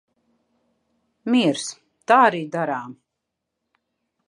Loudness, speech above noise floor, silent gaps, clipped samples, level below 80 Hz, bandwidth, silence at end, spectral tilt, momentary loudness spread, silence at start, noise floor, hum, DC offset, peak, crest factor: -20 LUFS; 61 dB; none; under 0.1%; -80 dBFS; 11 kHz; 1.35 s; -4.5 dB/octave; 19 LU; 1.25 s; -81 dBFS; none; under 0.1%; -2 dBFS; 22 dB